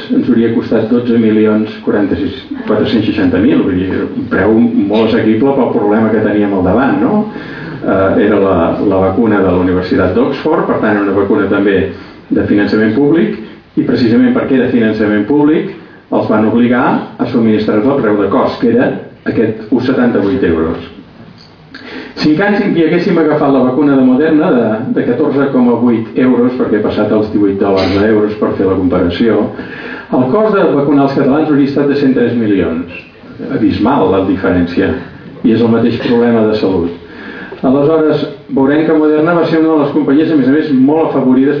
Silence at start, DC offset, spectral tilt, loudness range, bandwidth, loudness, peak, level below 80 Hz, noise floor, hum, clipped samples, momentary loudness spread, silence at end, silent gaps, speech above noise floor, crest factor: 0 s; under 0.1%; -9 dB/octave; 2 LU; 5.4 kHz; -11 LUFS; 0 dBFS; -44 dBFS; -36 dBFS; none; under 0.1%; 8 LU; 0 s; none; 26 dB; 10 dB